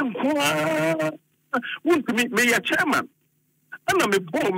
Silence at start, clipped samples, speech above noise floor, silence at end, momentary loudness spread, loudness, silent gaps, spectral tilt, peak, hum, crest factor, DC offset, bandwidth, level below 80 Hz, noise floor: 0 s; under 0.1%; 45 dB; 0 s; 10 LU; -22 LUFS; none; -3.5 dB/octave; -8 dBFS; none; 16 dB; under 0.1%; 16 kHz; -66 dBFS; -67 dBFS